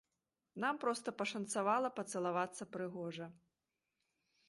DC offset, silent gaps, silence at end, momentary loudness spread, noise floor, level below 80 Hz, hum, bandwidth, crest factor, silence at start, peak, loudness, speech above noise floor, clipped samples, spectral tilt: under 0.1%; none; 1.15 s; 11 LU; -90 dBFS; -86 dBFS; none; 11.5 kHz; 18 dB; 0.55 s; -22 dBFS; -39 LUFS; 50 dB; under 0.1%; -4 dB/octave